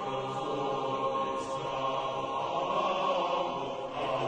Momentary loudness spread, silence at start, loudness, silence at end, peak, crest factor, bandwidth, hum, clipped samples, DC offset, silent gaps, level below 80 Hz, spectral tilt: 5 LU; 0 s; -32 LUFS; 0 s; -18 dBFS; 14 dB; 9.8 kHz; none; under 0.1%; under 0.1%; none; -64 dBFS; -5 dB/octave